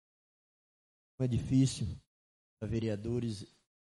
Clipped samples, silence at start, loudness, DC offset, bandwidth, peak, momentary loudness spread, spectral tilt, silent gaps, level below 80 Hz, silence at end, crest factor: under 0.1%; 1.2 s; -34 LUFS; under 0.1%; 11.5 kHz; -18 dBFS; 16 LU; -7 dB/octave; 2.07-2.57 s; -58 dBFS; 0.45 s; 18 dB